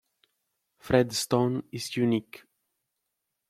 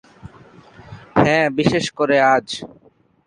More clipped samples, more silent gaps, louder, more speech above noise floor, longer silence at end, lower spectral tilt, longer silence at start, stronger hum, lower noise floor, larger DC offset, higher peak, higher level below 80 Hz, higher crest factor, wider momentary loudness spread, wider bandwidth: neither; neither; second, -27 LUFS vs -17 LUFS; first, 56 dB vs 28 dB; first, 1.25 s vs 0.6 s; about the same, -5 dB/octave vs -5.5 dB/octave; first, 0.85 s vs 0.25 s; neither; first, -83 dBFS vs -46 dBFS; neither; second, -6 dBFS vs -2 dBFS; second, -60 dBFS vs -50 dBFS; first, 24 dB vs 18 dB; second, 8 LU vs 15 LU; first, 15.5 kHz vs 11 kHz